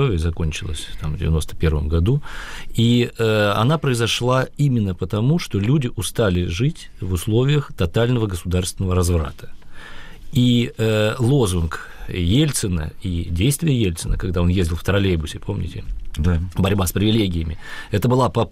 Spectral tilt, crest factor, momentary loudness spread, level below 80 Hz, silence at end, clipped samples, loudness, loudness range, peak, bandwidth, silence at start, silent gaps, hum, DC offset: -6 dB/octave; 12 dB; 10 LU; -32 dBFS; 0 s; under 0.1%; -20 LUFS; 2 LU; -8 dBFS; 15.5 kHz; 0 s; none; none; under 0.1%